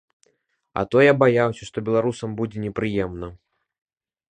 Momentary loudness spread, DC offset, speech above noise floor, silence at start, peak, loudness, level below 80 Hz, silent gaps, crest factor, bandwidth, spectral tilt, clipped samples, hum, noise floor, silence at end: 15 LU; under 0.1%; 48 dB; 0.75 s; -2 dBFS; -21 LUFS; -50 dBFS; none; 22 dB; 9.8 kHz; -7 dB/octave; under 0.1%; none; -69 dBFS; 1 s